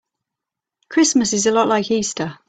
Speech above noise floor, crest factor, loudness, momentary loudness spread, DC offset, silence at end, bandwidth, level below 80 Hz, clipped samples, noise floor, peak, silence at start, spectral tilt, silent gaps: 67 dB; 16 dB; -17 LUFS; 7 LU; under 0.1%; 0.15 s; 9.2 kHz; -58 dBFS; under 0.1%; -85 dBFS; -4 dBFS; 0.9 s; -3 dB/octave; none